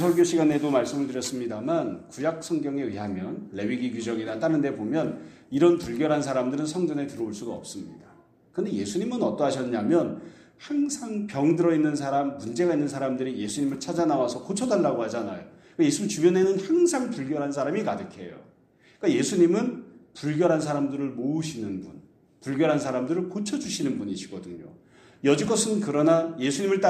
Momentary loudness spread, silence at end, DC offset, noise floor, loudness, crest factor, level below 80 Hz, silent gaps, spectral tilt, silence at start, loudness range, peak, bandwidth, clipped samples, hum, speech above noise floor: 13 LU; 0 s; under 0.1%; -59 dBFS; -26 LUFS; 20 dB; -66 dBFS; none; -5.5 dB/octave; 0 s; 4 LU; -6 dBFS; 14 kHz; under 0.1%; none; 33 dB